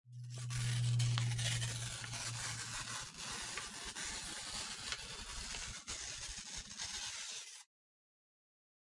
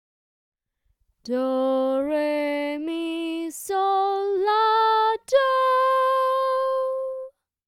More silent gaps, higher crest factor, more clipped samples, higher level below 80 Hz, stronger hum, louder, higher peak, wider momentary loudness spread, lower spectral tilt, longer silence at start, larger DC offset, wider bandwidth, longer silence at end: neither; first, 24 dB vs 14 dB; neither; first, -60 dBFS vs -70 dBFS; neither; second, -41 LUFS vs -23 LUFS; second, -20 dBFS vs -8 dBFS; about the same, 9 LU vs 10 LU; about the same, -2.5 dB/octave vs -2.5 dB/octave; second, 0.05 s vs 1.25 s; neither; second, 11.5 kHz vs 16 kHz; first, 1.25 s vs 0.4 s